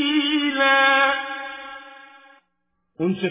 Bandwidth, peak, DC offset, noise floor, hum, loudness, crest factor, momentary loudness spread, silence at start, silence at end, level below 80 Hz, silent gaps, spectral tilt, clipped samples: 3.8 kHz; -4 dBFS; under 0.1%; -75 dBFS; none; -19 LUFS; 18 dB; 21 LU; 0 s; 0 s; -66 dBFS; none; -8 dB/octave; under 0.1%